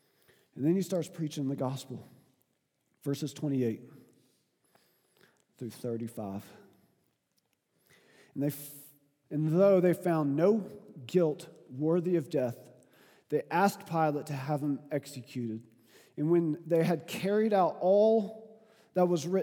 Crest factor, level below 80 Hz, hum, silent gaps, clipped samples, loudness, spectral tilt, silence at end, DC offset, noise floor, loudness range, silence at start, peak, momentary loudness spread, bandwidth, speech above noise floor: 20 dB; -88 dBFS; none; none; under 0.1%; -31 LUFS; -7 dB/octave; 0 s; under 0.1%; -78 dBFS; 15 LU; 0.55 s; -12 dBFS; 18 LU; 19.5 kHz; 48 dB